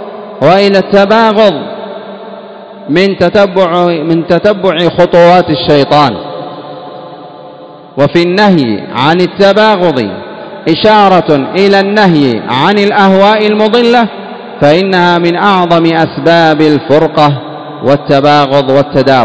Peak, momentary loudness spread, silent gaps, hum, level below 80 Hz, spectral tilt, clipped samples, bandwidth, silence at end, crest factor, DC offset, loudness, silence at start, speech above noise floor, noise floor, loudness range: 0 dBFS; 18 LU; none; none; -44 dBFS; -7 dB/octave; 4%; 8 kHz; 0 s; 8 dB; 0.6%; -7 LUFS; 0 s; 23 dB; -30 dBFS; 3 LU